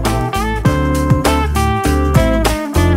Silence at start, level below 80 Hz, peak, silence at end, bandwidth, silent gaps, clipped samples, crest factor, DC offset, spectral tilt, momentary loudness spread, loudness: 0 s; -20 dBFS; 0 dBFS; 0 s; 16.5 kHz; none; under 0.1%; 14 dB; under 0.1%; -6 dB/octave; 3 LU; -15 LUFS